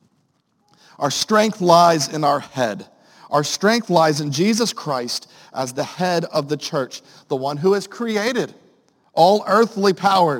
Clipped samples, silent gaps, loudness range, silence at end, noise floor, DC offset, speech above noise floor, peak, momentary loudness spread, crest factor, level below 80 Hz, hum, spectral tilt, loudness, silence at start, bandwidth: under 0.1%; none; 5 LU; 0 s; -65 dBFS; under 0.1%; 46 dB; 0 dBFS; 12 LU; 18 dB; -68 dBFS; none; -4.5 dB/octave; -19 LUFS; 1 s; 17 kHz